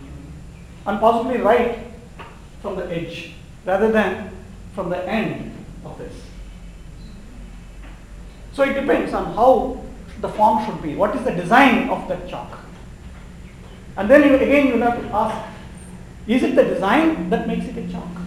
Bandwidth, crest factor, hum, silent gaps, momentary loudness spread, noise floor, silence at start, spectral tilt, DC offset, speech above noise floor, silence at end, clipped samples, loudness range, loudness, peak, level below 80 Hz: 16 kHz; 20 dB; none; none; 25 LU; -38 dBFS; 0 s; -6.5 dB/octave; under 0.1%; 20 dB; 0 s; under 0.1%; 11 LU; -19 LUFS; 0 dBFS; -40 dBFS